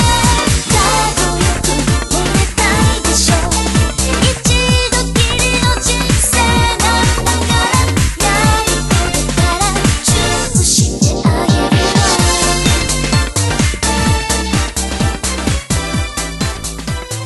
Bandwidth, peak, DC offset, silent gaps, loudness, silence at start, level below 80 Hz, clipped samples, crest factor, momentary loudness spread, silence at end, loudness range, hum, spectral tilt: 12.5 kHz; 0 dBFS; under 0.1%; none; -13 LUFS; 0 s; -20 dBFS; under 0.1%; 12 dB; 6 LU; 0 s; 3 LU; none; -3.5 dB/octave